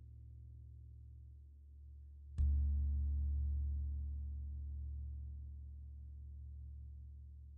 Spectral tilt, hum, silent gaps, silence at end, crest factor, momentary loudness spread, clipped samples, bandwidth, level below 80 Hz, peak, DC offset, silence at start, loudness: -15 dB/octave; 60 Hz at -75 dBFS; none; 0 s; 16 dB; 19 LU; under 0.1%; 0.7 kHz; -42 dBFS; -26 dBFS; under 0.1%; 0 s; -43 LUFS